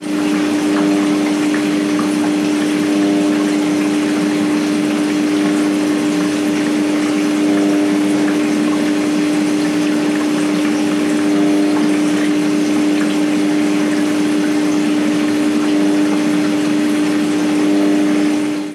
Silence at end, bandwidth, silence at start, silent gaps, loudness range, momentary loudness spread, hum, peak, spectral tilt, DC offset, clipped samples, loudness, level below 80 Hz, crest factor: 0 s; 13 kHz; 0 s; none; 1 LU; 2 LU; none; -4 dBFS; -5 dB/octave; under 0.1%; under 0.1%; -15 LUFS; -66 dBFS; 10 dB